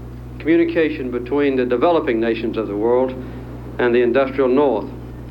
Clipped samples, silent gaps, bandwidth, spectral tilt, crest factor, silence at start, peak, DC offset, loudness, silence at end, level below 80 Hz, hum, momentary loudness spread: under 0.1%; none; 5.4 kHz; -8.5 dB/octave; 16 dB; 0 s; -4 dBFS; under 0.1%; -18 LUFS; 0 s; -40 dBFS; none; 16 LU